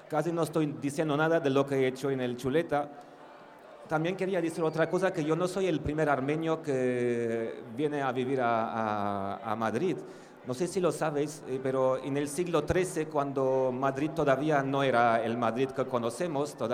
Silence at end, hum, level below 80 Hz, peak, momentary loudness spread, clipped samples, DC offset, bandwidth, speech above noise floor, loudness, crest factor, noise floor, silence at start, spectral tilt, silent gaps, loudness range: 0 s; none; -60 dBFS; -12 dBFS; 7 LU; under 0.1%; under 0.1%; 15.5 kHz; 21 dB; -30 LUFS; 18 dB; -51 dBFS; 0 s; -6 dB/octave; none; 3 LU